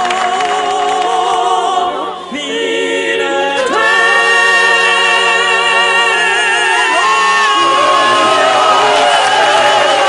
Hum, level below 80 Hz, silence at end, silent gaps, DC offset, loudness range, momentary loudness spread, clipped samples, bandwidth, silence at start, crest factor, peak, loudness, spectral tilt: none; -56 dBFS; 0 s; none; under 0.1%; 5 LU; 6 LU; under 0.1%; 12.5 kHz; 0 s; 10 dB; 0 dBFS; -10 LUFS; -1 dB/octave